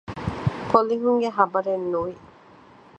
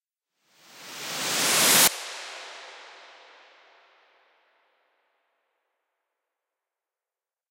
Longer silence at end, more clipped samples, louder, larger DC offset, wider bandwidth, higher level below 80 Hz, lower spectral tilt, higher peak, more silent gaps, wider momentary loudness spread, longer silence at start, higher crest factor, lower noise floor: second, 0.8 s vs 4.55 s; neither; second, -23 LUFS vs -20 LUFS; neither; second, 8.6 kHz vs 16 kHz; first, -48 dBFS vs -78 dBFS; first, -8 dB/octave vs 0 dB/octave; first, -2 dBFS vs -6 dBFS; neither; second, 8 LU vs 27 LU; second, 0.1 s vs 0.75 s; about the same, 22 dB vs 24 dB; second, -50 dBFS vs under -90 dBFS